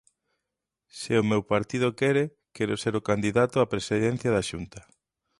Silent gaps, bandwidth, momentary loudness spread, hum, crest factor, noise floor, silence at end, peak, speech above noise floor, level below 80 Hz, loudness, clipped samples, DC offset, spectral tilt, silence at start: none; 11.5 kHz; 10 LU; none; 18 dB; -86 dBFS; 0.6 s; -10 dBFS; 60 dB; -56 dBFS; -26 LUFS; under 0.1%; under 0.1%; -6 dB/octave; 0.95 s